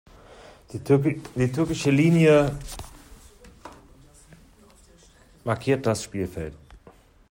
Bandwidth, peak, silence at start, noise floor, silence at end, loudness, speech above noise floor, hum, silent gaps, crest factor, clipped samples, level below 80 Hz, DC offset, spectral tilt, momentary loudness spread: 16.5 kHz; -6 dBFS; 0.7 s; -54 dBFS; 0.55 s; -23 LUFS; 32 dB; none; none; 20 dB; under 0.1%; -48 dBFS; under 0.1%; -6.5 dB/octave; 21 LU